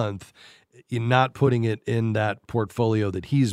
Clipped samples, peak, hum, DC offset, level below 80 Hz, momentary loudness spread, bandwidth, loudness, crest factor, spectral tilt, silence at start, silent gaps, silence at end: under 0.1%; -4 dBFS; none; under 0.1%; -58 dBFS; 8 LU; 11.5 kHz; -24 LUFS; 20 dB; -7 dB/octave; 0 s; none; 0 s